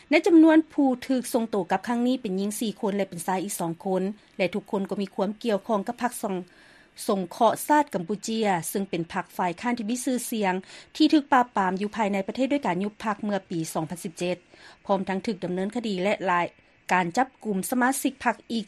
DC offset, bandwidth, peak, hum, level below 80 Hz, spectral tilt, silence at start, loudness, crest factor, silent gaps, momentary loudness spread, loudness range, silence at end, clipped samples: under 0.1%; 13.5 kHz; -6 dBFS; none; -66 dBFS; -5 dB/octave; 0.1 s; -26 LUFS; 20 dB; none; 9 LU; 4 LU; 0.05 s; under 0.1%